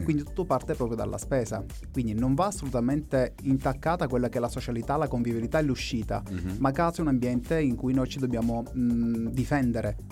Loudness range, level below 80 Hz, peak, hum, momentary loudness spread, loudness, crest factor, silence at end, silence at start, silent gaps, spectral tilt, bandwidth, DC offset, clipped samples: 1 LU; -42 dBFS; -12 dBFS; none; 5 LU; -28 LUFS; 16 dB; 0 s; 0 s; none; -7 dB/octave; 16 kHz; under 0.1%; under 0.1%